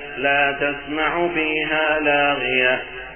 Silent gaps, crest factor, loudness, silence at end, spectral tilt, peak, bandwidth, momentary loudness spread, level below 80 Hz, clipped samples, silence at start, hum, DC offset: none; 16 dB; -19 LUFS; 0 s; -8.5 dB/octave; -4 dBFS; 3.4 kHz; 5 LU; -48 dBFS; under 0.1%; 0 s; none; 0.3%